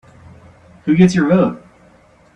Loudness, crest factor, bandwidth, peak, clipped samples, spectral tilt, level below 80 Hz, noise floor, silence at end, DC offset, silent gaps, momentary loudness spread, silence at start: -14 LUFS; 18 dB; 9.4 kHz; 0 dBFS; under 0.1%; -7.5 dB/octave; -50 dBFS; -49 dBFS; 0.75 s; under 0.1%; none; 15 LU; 0.85 s